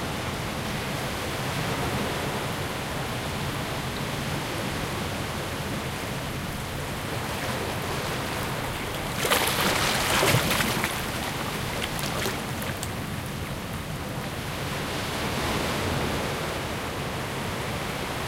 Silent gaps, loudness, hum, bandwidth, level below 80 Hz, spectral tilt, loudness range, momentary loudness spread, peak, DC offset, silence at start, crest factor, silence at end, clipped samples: none; -28 LUFS; none; 17 kHz; -44 dBFS; -4 dB/octave; 6 LU; 9 LU; -6 dBFS; under 0.1%; 0 s; 22 dB; 0 s; under 0.1%